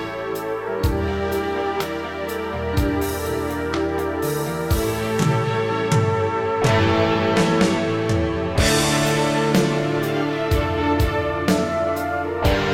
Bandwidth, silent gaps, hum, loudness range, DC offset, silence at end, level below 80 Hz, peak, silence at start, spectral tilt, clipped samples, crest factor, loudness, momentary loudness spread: 17 kHz; none; none; 5 LU; 0.1%; 0 s; -34 dBFS; -6 dBFS; 0 s; -5.5 dB/octave; under 0.1%; 16 dB; -21 LUFS; 7 LU